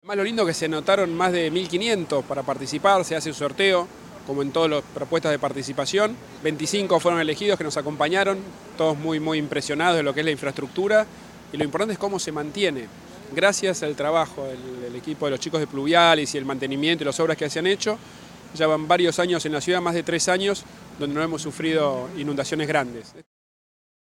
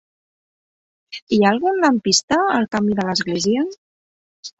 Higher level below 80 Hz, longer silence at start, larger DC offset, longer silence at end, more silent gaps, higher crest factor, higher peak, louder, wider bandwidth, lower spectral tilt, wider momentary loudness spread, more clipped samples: about the same, -60 dBFS vs -58 dBFS; second, 0.05 s vs 1.1 s; neither; first, 0.85 s vs 0.1 s; second, none vs 1.22-1.27 s, 2.23-2.28 s, 3.78-4.43 s; about the same, 20 dB vs 18 dB; about the same, -2 dBFS vs -2 dBFS; second, -23 LUFS vs -18 LUFS; first, 16 kHz vs 8 kHz; about the same, -4 dB/octave vs -4 dB/octave; about the same, 11 LU vs 12 LU; neither